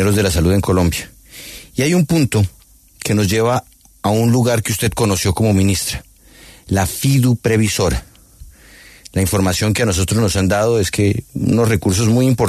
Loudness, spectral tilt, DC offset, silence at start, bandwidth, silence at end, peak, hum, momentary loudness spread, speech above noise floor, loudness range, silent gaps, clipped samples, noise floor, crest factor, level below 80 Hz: -16 LUFS; -5.5 dB/octave; under 0.1%; 0 s; 14 kHz; 0 s; -2 dBFS; none; 9 LU; 28 dB; 2 LU; none; under 0.1%; -43 dBFS; 14 dB; -34 dBFS